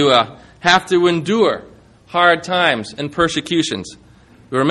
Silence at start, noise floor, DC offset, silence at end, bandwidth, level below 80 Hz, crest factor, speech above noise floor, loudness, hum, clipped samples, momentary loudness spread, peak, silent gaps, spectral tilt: 0 s; -36 dBFS; under 0.1%; 0 s; 12 kHz; -50 dBFS; 16 dB; 21 dB; -16 LUFS; none; under 0.1%; 11 LU; 0 dBFS; none; -4 dB/octave